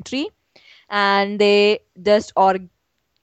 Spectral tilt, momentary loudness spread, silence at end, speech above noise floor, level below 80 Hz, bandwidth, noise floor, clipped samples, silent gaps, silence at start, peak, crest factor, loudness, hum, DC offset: -4.5 dB/octave; 12 LU; 0.55 s; 34 dB; -60 dBFS; 8.6 kHz; -51 dBFS; under 0.1%; none; 0.05 s; -4 dBFS; 16 dB; -18 LUFS; none; under 0.1%